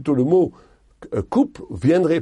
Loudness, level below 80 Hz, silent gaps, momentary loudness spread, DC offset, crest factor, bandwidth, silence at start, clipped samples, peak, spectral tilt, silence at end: -20 LUFS; -48 dBFS; none; 9 LU; under 0.1%; 14 dB; 10.5 kHz; 0 s; under 0.1%; -6 dBFS; -8.5 dB/octave; 0 s